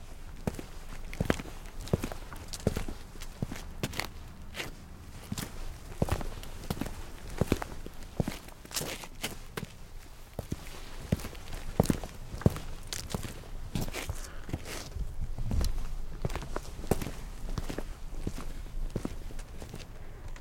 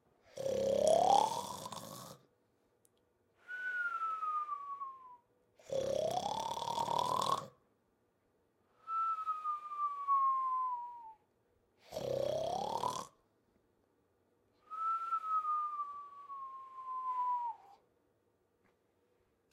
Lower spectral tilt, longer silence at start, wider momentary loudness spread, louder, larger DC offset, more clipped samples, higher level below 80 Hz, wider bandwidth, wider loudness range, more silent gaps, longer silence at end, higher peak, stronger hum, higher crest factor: first, -5 dB/octave vs -3.5 dB/octave; second, 0 s vs 0.35 s; second, 13 LU vs 17 LU; about the same, -38 LUFS vs -37 LUFS; neither; neither; first, -40 dBFS vs -74 dBFS; about the same, 17 kHz vs 16.5 kHz; about the same, 4 LU vs 6 LU; neither; second, 0 s vs 1.8 s; first, -8 dBFS vs -16 dBFS; neither; about the same, 28 dB vs 24 dB